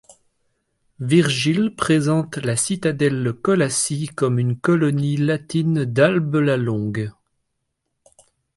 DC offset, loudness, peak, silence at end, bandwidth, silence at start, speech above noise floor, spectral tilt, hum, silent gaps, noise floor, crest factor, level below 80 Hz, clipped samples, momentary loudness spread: under 0.1%; -20 LUFS; -2 dBFS; 1.45 s; 11.5 kHz; 1 s; 56 dB; -5.5 dB/octave; none; none; -75 dBFS; 18 dB; -56 dBFS; under 0.1%; 6 LU